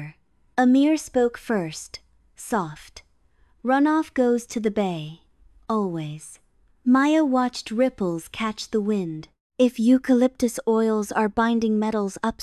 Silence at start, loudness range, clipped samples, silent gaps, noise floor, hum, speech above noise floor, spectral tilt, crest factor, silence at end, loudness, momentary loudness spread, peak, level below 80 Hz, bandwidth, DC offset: 0 s; 4 LU; under 0.1%; 9.40-9.50 s; -61 dBFS; none; 39 dB; -5.5 dB/octave; 16 dB; 0 s; -23 LUFS; 17 LU; -6 dBFS; -56 dBFS; 13 kHz; under 0.1%